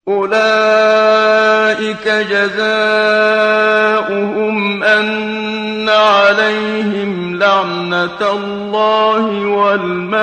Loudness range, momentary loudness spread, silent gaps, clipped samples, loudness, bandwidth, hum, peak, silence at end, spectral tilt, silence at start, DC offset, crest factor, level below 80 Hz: 3 LU; 7 LU; none; under 0.1%; -12 LUFS; 9.4 kHz; none; 0 dBFS; 0 s; -4.5 dB/octave; 0.05 s; under 0.1%; 12 dB; -58 dBFS